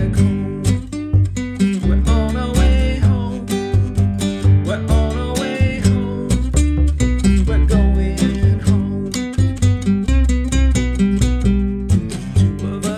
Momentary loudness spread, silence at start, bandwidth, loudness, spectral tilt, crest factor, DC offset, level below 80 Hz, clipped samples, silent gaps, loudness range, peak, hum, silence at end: 5 LU; 0 s; 13 kHz; -17 LUFS; -6.5 dB/octave; 14 dB; under 0.1%; -20 dBFS; under 0.1%; none; 1 LU; -2 dBFS; none; 0 s